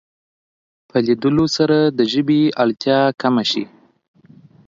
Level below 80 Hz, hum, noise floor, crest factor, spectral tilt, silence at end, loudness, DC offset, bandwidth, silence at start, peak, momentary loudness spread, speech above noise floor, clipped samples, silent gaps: -58 dBFS; none; -47 dBFS; 16 dB; -6 dB/octave; 1.05 s; -17 LUFS; under 0.1%; 7.6 kHz; 0.95 s; -2 dBFS; 5 LU; 31 dB; under 0.1%; none